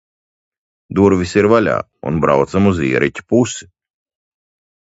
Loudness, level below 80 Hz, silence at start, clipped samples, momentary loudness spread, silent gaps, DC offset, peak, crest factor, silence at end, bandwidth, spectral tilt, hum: -15 LUFS; -40 dBFS; 0.9 s; under 0.1%; 8 LU; none; under 0.1%; 0 dBFS; 16 dB; 1.2 s; 8 kHz; -6.5 dB/octave; none